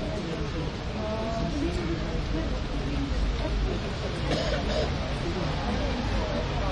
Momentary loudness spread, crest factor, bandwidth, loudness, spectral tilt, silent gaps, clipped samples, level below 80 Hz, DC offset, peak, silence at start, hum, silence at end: 4 LU; 14 dB; 10.5 kHz; -30 LUFS; -6 dB/octave; none; under 0.1%; -32 dBFS; under 0.1%; -14 dBFS; 0 s; none; 0 s